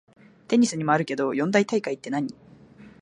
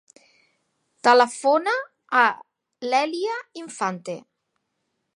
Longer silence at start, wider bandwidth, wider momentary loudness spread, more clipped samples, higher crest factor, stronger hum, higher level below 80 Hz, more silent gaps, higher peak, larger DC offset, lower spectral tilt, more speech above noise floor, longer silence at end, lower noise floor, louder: second, 0.5 s vs 1.05 s; about the same, 11 kHz vs 11.5 kHz; second, 8 LU vs 18 LU; neither; about the same, 20 dB vs 20 dB; neither; first, -70 dBFS vs -84 dBFS; neither; about the same, -6 dBFS vs -4 dBFS; neither; first, -5.5 dB/octave vs -3 dB/octave; second, 26 dB vs 55 dB; second, 0.15 s vs 0.95 s; second, -49 dBFS vs -76 dBFS; about the same, -24 LUFS vs -22 LUFS